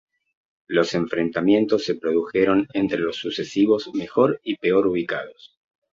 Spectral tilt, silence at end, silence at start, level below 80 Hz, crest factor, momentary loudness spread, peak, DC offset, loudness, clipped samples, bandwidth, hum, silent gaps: -6 dB/octave; 0.45 s; 0.7 s; -60 dBFS; 18 dB; 6 LU; -4 dBFS; under 0.1%; -22 LUFS; under 0.1%; 7.6 kHz; none; none